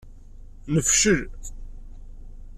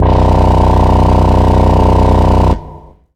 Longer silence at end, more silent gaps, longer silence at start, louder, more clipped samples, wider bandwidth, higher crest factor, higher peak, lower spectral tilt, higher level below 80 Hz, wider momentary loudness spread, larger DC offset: second, 0 s vs 0.4 s; neither; about the same, 0 s vs 0 s; second, -20 LUFS vs -10 LUFS; neither; first, 14 kHz vs 9.2 kHz; first, 20 dB vs 8 dB; second, -8 dBFS vs 0 dBFS; second, -3 dB/octave vs -8.5 dB/octave; second, -38 dBFS vs -14 dBFS; first, 24 LU vs 2 LU; neither